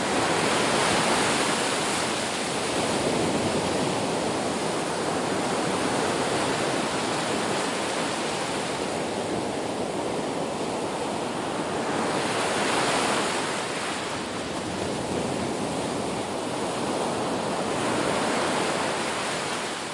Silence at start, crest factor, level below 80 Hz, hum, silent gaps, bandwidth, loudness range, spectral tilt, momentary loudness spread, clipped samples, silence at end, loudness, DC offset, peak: 0 s; 16 dB; -58 dBFS; none; none; 11.5 kHz; 4 LU; -3.5 dB/octave; 6 LU; under 0.1%; 0 s; -26 LUFS; under 0.1%; -10 dBFS